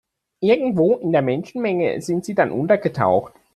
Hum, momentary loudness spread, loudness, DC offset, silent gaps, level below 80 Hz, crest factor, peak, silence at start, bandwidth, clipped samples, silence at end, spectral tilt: none; 6 LU; -20 LUFS; under 0.1%; none; -60 dBFS; 18 dB; -2 dBFS; 0.4 s; 12.5 kHz; under 0.1%; 0.25 s; -7 dB/octave